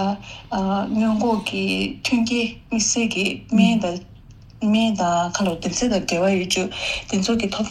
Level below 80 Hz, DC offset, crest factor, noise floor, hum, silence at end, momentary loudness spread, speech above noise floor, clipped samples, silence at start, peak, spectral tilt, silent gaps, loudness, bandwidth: -46 dBFS; under 0.1%; 16 dB; -44 dBFS; none; 0 s; 6 LU; 23 dB; under 0.1%; 0 s; -4 dBFS; -4 dB/octave; none; -21 LUFS; 12.5 kHz